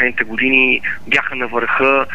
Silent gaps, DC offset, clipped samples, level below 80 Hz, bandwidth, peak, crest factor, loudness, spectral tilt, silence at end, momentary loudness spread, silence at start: none; 4%; under 0.1%; -48 dBFS; 10.5 kHz; 0 dBFS; 16 dB; -14 LUFS; -4.5 dB/octave; 0 s; 6 LU; 0 s